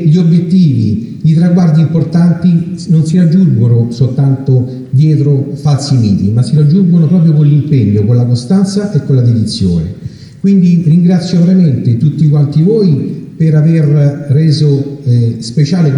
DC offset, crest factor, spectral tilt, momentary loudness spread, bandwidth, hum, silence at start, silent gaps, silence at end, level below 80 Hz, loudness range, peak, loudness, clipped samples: under 0.1%; 8 dB; -8.5 dB/octave; 6 LU; 10.5 kHz; none; 0 s; none; 0 s; -42 dBFS; 1 LU; 0 dBFS; -9 LUFS; under 0.1%